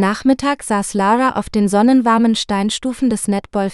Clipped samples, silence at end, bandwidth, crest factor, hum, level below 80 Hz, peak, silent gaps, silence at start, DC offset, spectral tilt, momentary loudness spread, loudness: under 0.1%; 0 s; 12.5 kHz; 14 dB; none; -44 dBFS; -2 dBFS; none; 0 s; under 0.1%; -5 dB/octave; 7 LU; -16 LUFS